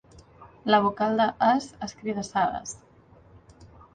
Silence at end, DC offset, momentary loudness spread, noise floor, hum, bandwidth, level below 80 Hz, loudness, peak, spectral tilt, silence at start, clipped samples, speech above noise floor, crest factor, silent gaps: 0.3 s; under 0.1%; 15 LU; -54 dBFS; none; 9.6 kHz; -58 dBFS; -25 LUFS; -8 dBFS; -4.5 dB/octave; 0.15 s; under 0.1%; 30 dB; 20 dB; none